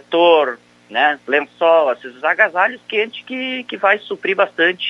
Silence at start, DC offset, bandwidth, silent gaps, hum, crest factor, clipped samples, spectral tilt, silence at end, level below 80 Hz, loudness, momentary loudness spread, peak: 0.1 s; under 0.1%; 7.2 kHz; none; 60 Hz at -60 dBFS; 16 dB; under 0.1%; -4.5 dB/octave; 0 s; -76 dBFS; -17 LUFS; 10 LU; 0 dBFS